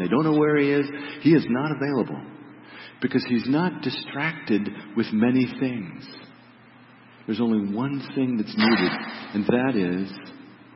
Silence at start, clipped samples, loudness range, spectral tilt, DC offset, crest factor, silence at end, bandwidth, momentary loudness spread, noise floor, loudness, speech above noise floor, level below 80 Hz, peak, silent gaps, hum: 0 s; under 0.1%; 3 LU; -10.5 dB/octave; under 0.1%; 18 dB; 0.2 s; 5.8 kHz; 20 LU; -50 dBFS; -24 LUFS; 27 dB; -66 dBFS; -6 dBFS; none; none